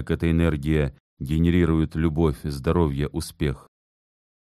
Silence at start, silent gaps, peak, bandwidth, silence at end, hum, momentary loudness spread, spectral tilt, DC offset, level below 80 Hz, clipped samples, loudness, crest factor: 0 s; 1.00-1.17 s; -8 dBFS; 13.5 kHz; 0.9 s; none; 8 LU; -7.5 dB/octave; under 0.1%; -34 dBFS; under 0.1%; -24 LUFS; 16 dB